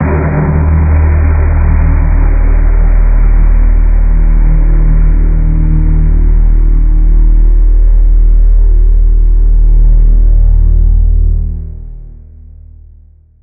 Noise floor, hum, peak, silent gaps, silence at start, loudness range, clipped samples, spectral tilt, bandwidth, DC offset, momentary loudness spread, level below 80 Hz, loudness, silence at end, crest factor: -39 dBFS; none; 0 dBFS; none; 0 s; 2 LU; under 0.1%; -8 dB/octave; 2.6 kHz; under 0.1%; 2 LU; -6 dBFS; -11 LUFS; 1.25 s; 6 dB